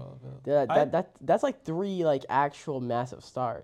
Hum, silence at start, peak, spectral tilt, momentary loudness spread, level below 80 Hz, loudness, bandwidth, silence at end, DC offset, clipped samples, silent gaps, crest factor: none; 0 s; -12 dBFS; -7 dB/octave; 10 LU; -66 dBFS; -28 LUFS; 10 kHz; 0 s; under 0.1%; under 0.1%; none; 18 dB